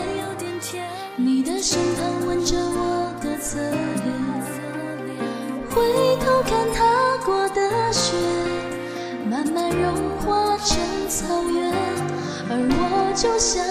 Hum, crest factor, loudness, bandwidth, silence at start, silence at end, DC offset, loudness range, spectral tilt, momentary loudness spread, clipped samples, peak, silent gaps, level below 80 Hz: none; 16 dB; -22 LUFS; 15.5 kHz; 0 s; 0 s; under 0.1%; 4 LU; -3.5 dB/octave; 10 LU; under 0.1%; -6 dBFS; none; -40 dBFS